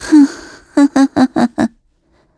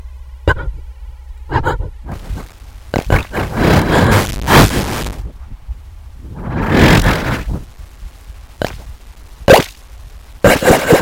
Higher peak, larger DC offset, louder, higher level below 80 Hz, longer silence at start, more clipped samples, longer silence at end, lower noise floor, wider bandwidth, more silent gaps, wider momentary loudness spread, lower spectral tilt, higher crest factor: about the same, 0 dBFS vs 0 dBFS; neither; about the same, -13 LUFS vs -13 LUFS; second, -50 dBFS vs -24 dBFS; about the same, 0 s vs 0.05 s; second, under 0.1% vs 0.2%; first, 0.7 s vs 0 s; first, -56 dBFS vs -34 dBFS; second, 11 kHz vs 17.5 kHz; neither; second, 9 LU vs 23 LU; about the same, -5 dB/octave vs -5.5 dB/octave; about the same, 14 dB vs 14 dB